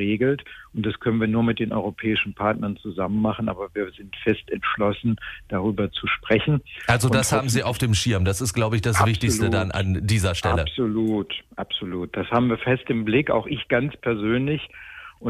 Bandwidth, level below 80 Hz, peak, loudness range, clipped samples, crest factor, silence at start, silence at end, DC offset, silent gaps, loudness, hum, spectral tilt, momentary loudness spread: 15.5 kHz; -42 dBFS; -6 dBFS; 4 LU; under 0.1%; 18 dB; 0 s; 0 s; under 0.1%; none; -23 LUFS; none; -5.5 dB/octave; 9 LU